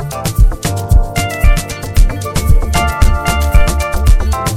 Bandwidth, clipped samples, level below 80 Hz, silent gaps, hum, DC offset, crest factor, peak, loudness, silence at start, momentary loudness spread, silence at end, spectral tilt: 16 kHz; 1%; -12 dBFS; none; none; under 0.1%; 10 dB; 0 dBFS; -14 LUFS; 0 s; 4 LU; 0 s; -5 dB/octave